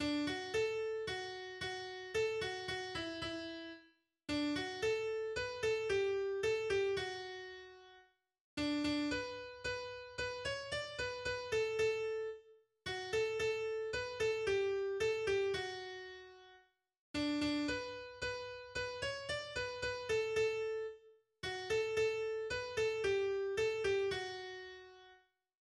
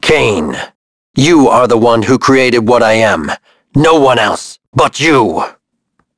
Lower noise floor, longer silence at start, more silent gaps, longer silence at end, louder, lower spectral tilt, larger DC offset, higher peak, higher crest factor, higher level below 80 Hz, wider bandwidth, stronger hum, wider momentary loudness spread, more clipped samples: first, -69 dBFS vs -63 dBFS; about the same, 0 s vs 0 s; second, 8.41-8.57 s, 16.99-17.14 s vs 0.75-1.14 s, 4.68-4.73 s; about the same, 0.55 s vs 0.65 s; second, -39 LUFS vs -10 LUFS; about the same, -4 dB/octave vs -5 dB/octave; neither; second, -24 dBFS vs 0 dBFS; about the same, 14 dB vs 10 dB; second, -64 dBFS vs -40 dBFS; first, 12.5 kHz vs 11 kHz; neither; about the same, 11 LU vs 13 LU; second, under 0.1% vs 0.1%